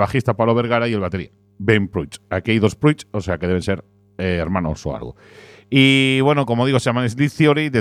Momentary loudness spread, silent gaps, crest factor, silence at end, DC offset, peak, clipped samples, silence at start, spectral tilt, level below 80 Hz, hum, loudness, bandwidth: 12 LU; none; 18 dB; 0 s; under 0.1%; 0 dBFS; under 0.1%; 0 s; -6 dB/octave; -44 dBFS; none; -18 LUFS; 13.5 kHz